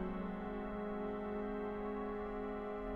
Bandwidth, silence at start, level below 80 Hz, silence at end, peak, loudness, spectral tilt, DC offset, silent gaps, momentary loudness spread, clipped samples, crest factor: 4.9 kHz; 0 s; -54 dBFS; 0 s; -30 dBFS; -42 LUFS; -9 dB/octave; under 0.1%; none; 1 LU; under 0.1%; 12 dB